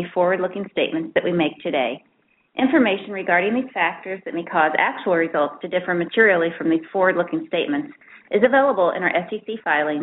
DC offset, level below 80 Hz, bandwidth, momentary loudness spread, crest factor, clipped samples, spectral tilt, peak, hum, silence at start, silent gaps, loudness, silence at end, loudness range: under 0.1%; -66 dBFS; 4.1 kHz; 10 LU; 18 dB; under 0.1%; -3 dB/octave; -2 dBFS; none; 0 s; none; -20 LUFS; 0 s; 2 LU